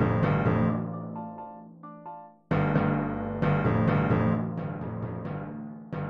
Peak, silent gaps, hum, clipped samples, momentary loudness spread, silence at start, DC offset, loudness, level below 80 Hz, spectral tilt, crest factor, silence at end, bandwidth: -12 dBFS; none; none; under 0.1%; 19 LU; 0 s; under 0.1%; -28 LUFS; -48 dBFS; -10.5 dB/octave; 16 dB; 0 s; 5.2 kHz